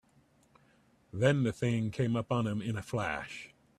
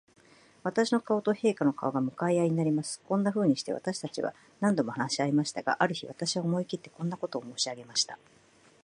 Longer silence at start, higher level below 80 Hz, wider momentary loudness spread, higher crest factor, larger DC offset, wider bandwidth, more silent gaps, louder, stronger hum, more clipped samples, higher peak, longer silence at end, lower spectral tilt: first, 1.15 s vs 0.65 s; first, -62 dBFS vs -76 dBFS; first, 13 LU vs 9 LU; about the same, 20 dB vs 22 dB; neither; first, 12.5 kHz vs 11 kHz; neither; about the same, -32 LUFS vs -30 LUFS; neither; neither; second, -14 dBFS vs -8 dBFS; second, 0.3 s vs 0.7 s; first, -7 dB/octave vs -5 dB/octave